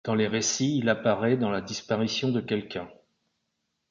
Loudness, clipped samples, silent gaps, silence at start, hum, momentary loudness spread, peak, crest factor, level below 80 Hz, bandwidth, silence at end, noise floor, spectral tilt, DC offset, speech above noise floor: -27 LUFS; under 0.1%; none; 0.05 s; none; 8 LU; -10 dBFS; 18 dB; -62 dBFS; 7.6 kHz; 0.95 s; -79 dBFS; -4.5 dB/octave; under 0.1%; 53 dB